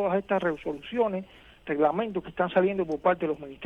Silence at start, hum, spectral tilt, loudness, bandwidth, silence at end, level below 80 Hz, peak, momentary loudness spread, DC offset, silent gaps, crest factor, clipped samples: 0 s; none; -8 dB/octave; -28 LUFS; 6.8 kHz; 0 s; -58 dBFS; -10 dBFS; 9 LU; under 0.1%; none; 18 dB; under 0.1%